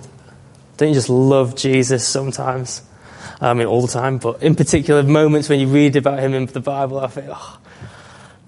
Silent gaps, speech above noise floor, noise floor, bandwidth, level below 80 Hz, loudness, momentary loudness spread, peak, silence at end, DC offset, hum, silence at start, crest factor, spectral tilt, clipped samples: none; 28 dB; -44 dBFS; 11.5 kHz; -46 dBFS; -16 LUFS; 13 LU; -2 dBFS; 0.45 s; under 0.1%; none; 0 s; 16 dB; -5.5 dB/octave; under 0.1%